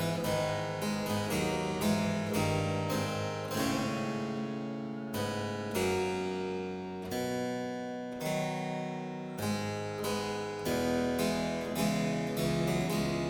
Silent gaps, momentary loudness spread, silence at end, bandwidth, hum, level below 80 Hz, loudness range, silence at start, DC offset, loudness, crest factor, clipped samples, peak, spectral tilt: none; 7 LU; 0 s; 19.5 kHz; none; -56 dBFS; 4 LU; 0 s; under 0.1%; -33 LUFS; 16 dB; under 0.1%; -18 dBFS; -5 dB/octave